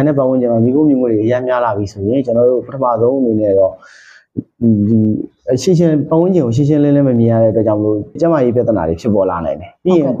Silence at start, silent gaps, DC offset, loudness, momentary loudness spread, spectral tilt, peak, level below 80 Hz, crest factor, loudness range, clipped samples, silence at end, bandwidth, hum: 0 s; none; under 0.1%; -13 LUFS; 6 LU; -8.5 dB/octave; -2 dBFS; -46 dBFS; 12 dB; 2 LU; under 0.1%; 0 s; 9 kHz; none